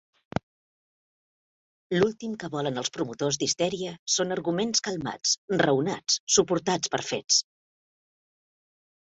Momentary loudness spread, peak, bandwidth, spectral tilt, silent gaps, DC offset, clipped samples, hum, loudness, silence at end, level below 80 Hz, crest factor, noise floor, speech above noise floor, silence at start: 10 LU; -8 dBFS; 8.4 kHz; -3 dB/octave; 3.99-4.06 s, 5.38-5.48 s, 6.20-6.27 s; under 0.1%; under 0.1%; none; -26 LUFS; 1.6 s; -62 dBFS; 22 dB; under -90 dBFS; over 63 dB; 1.9 s